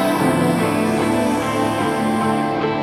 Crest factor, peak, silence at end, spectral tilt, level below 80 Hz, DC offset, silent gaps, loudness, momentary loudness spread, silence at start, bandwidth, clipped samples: 12 dB; -6 dBFS; 0 s; -5.5 dB/octave; -48 dBFS; under 0.1%; none; -18 LUFS; 2 LU; 0 s; 17.5 kHz; under 0.1%